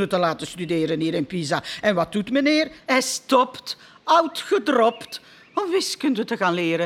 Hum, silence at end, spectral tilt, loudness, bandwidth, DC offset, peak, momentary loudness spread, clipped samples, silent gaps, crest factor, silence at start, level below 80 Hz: none; 0 s; -4 dB/octave; -22 LUFS; 16.5 kHz; under 0.1%; -4 dBFS; 11 LU; under 0.1%; none; 18 dB; 0 s; -62 dBFS